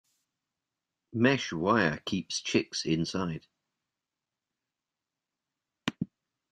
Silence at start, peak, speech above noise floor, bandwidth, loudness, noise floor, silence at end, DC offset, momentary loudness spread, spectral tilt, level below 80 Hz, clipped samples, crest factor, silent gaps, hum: 1.15 s; -10 dBFS; 61 dB; 10.5 kHz; -30 LUFS; -90 dBFS; 0.45 s; under 0.1%; 13 LU; -4.5 dB/octave; -66 dBFS; under 0.1%; 24 dB; none; none